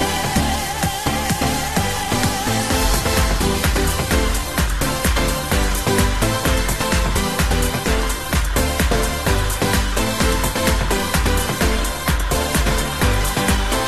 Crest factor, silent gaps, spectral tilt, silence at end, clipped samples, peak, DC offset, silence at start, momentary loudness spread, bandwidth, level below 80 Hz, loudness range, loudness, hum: 14 dB; none; -4 dB/octave; 0 s; under 0.1%; -4 dBFS; 1%; 0 s; 3 LU; 14 kHz; -22 dBFS; 0 LU; -19 LUFS; none